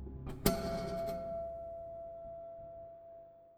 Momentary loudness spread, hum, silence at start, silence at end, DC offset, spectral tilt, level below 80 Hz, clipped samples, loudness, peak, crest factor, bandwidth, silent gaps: 18 LU; none; 0 s; 0 s; under 0.1%; -5 dB/octave; -52 dBFS; under 0.1%; -40 LUFS; -14 dBFS; 26 dB; over 20 kHz; none